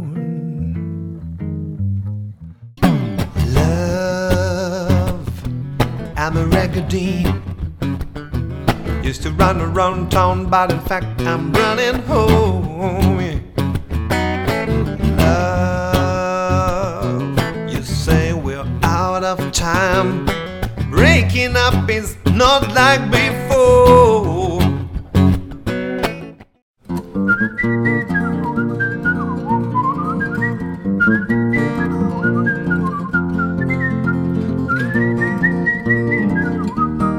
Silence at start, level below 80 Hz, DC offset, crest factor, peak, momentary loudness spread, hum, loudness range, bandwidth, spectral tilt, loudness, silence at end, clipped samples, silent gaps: 0 s; -30 dBFS; under 0.1%; 16 dB; 0 dBFS; 10 LU; none; 7 LU; 19 kHz; -6 dB/octave; -17 LUFS; 0 s; under 0.1%; 26.62-26.74 s